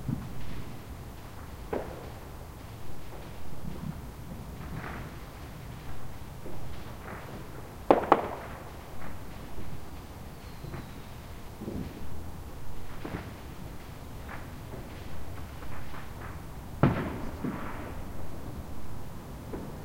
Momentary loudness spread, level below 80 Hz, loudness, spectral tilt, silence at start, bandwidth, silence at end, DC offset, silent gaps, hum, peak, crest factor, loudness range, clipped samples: 12 LU; -46 dBFS; -37 LUFS; -6.5 dB/octave; 0 s; 16 kHz; 0 s; under 0.1%; none; none; -2 dBFS; 32 dB; 11 LU; under 0.1%